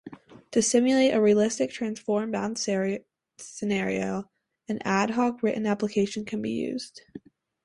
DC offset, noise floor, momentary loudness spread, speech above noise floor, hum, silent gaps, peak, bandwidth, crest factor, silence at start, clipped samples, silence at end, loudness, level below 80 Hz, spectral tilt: under 0.1%; -47 dBFS; 14 LU; 22 dB; none; none; -10 dBFS; 11.5 kHz; 18 dB; 0.05 s; under 0.1%; 0.45 s; -26 LUFS; -66 dBFS; -4.5 dB/octave